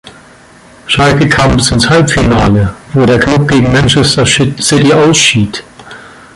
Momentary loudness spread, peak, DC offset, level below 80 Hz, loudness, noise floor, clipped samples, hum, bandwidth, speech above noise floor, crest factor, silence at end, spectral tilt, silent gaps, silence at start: 6 LU; 0 dBFS; under 0.1%; -26 dBFS; -8 LUFS; -38 dBFS; under 0.1%; none; 11.5 kHz; 30 dB; 10 dB; 0.3 s; -4.5 dB/octave; none; 0.05 s